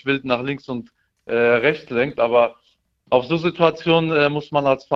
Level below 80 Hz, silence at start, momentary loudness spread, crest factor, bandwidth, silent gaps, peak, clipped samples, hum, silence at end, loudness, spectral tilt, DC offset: -58 dBFS; 0.05 s; 9 LU; 18 dB; 6.4 kHz; none; -2 dBFS; under 0.1%; none; 0 s; -19 LUFS; -7 dB/octave; under 0.1%